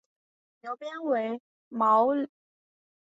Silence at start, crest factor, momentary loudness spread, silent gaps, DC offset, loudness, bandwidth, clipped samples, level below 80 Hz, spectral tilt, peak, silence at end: 0.65 s; 18 dB; 17 LU; 1.40-1.71 s; under 0.1%; -27 LUFS; 7.8 kHz; under 0.1%; -82 dBFS; -6.5 dB/octave; -12 dBFS; 0.9 s